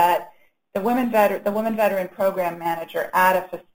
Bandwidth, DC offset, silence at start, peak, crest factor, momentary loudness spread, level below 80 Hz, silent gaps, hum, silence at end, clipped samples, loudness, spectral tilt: 17 kHz; 0.3%; 0 s; -4 dBFS; 18 dB; 8 LU; -64 dBFS; none; none; 0.15 s; under 0.1%; -22 LUFS; -5 dB/octave